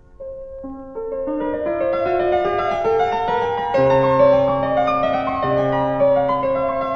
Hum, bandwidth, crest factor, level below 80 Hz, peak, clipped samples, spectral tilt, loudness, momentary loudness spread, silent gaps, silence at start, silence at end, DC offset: none; 6.6 kHz; 14 dB; -44 dBFS; -4 dBFS; under 0.1%; -7.5 dB/octave; -18 LUFS; 16 LU; none; 0.2 s; 0 s; under 0.1%